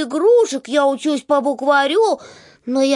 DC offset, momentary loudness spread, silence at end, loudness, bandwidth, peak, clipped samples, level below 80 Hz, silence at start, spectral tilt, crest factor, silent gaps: under 0.1%; 9 LU; 0 s; -17 LUFS; 11.5 kHz; -4 dBFS; under 0.1%; -72 dBFS; 0 s; -2.5 dB/octave; 12 dB; none